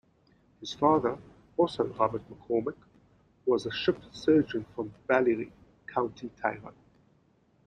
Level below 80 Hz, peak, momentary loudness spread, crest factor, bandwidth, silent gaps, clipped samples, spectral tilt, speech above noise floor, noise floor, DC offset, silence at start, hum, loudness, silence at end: -64 dBFS; -8 dBFS; 16 LU; 22 dB; 9.6 kHz; none; under 0.1%; -6.5 dB/octave; 38 dB; -66 dBFS; under 0.1%; 0.6 s; none; -30 LUFS; 0.95 s